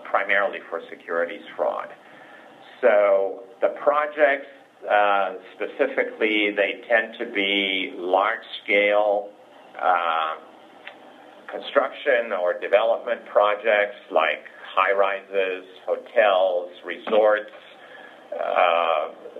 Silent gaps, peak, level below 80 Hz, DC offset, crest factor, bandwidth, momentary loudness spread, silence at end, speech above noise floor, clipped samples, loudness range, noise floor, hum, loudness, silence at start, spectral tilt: none; -4 dBFS; -88 dBFS; under 0.1%; 20 dB; 4.5 kHz; 14 LU; 0 s; 24 dB; under 0.1%; 3 LU; -47 dBFS; none; -22 LUFS; 0 s; -4.5 dB/octave